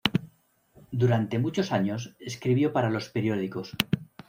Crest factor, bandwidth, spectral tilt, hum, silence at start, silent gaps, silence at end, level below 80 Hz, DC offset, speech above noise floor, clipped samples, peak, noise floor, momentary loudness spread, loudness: 26 dB; 16 kHz; -6.5 dB/octave; none; 0.05 s; none; 0.25 s; -60 dBFS; under 0.1%; 35 dB; under 0.1%; -2 dBFS; -61 dBFS; 9 LU; -28 LUFS